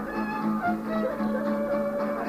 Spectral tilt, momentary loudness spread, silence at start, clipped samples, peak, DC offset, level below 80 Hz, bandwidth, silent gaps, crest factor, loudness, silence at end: -7.5 dB/octave; 2 LU; 0 s; under 0.1%; -14 dBFS; under 0.1%; -54 dBFS; 15.5 kHz; none; 14 dB; -28 LUFS; 0 s